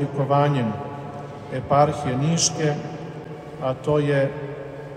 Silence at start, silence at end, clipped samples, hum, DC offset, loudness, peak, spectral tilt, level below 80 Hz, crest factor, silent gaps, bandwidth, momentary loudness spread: 0 s; 0 s; under 0.1%; none; under 0.1%; -22 LUFS; -6 dBFS; -5 dB/octave; -54 dBFS; 18 dB; none; 11.5 kHz; 15 LU